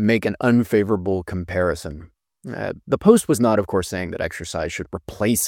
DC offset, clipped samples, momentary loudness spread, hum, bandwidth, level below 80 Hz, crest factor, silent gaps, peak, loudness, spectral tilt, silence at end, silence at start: under 0.1%; under 0.1%; 15 LU; none; 17 kHz; -44 dBFS; 20 dB; none; 0 dBFS; -21 LUFS; -5.5 dB/octave; 0 s; 0 s